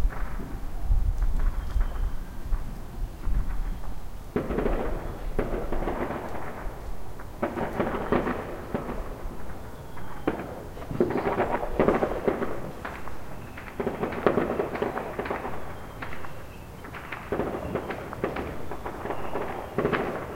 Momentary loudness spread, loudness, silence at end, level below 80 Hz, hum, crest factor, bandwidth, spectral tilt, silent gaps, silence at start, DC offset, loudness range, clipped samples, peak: 14 LU; -31 LUFS; 0 s; -32 dBFS; none; 24 dB; 16 kHz; -7 dB/octave; none; 0 s; under 0.1%; 6 LU; under 0.1%; -4 dBFS